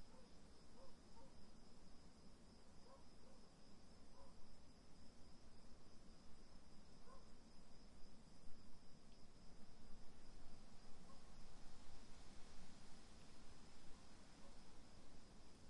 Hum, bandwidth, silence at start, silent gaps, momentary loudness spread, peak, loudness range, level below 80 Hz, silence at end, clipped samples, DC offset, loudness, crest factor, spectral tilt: none; 11 kHz; 0 s; none; 3 LU; -38 dBFS; 2 LU; -66 dBFS; 0 s; under 0.1%; under 0.1%; -67 LUFS; 14 dB; -4.5 dB/octave